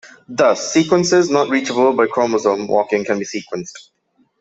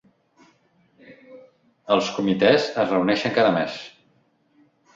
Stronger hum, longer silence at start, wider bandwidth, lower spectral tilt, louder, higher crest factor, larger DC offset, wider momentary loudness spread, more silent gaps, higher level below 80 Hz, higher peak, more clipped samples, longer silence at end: neither; second, 0.05 s vs 1.1 s; about the same, 8 kHz vs 7.8 kHz; about the same, -4.5 dB/octave vs -5.5 dB/octave; first, -16 LUFS vs -21 LUFS; second, 14 dB vs 22 dB; neither; second, 12 LU vs 16 LU; neither; about the same, -60 dBFS vs -64 dBFS; about the same, -2 dBFS vs -2 dBFS; neither; second, 0.6 s vs 1.05 s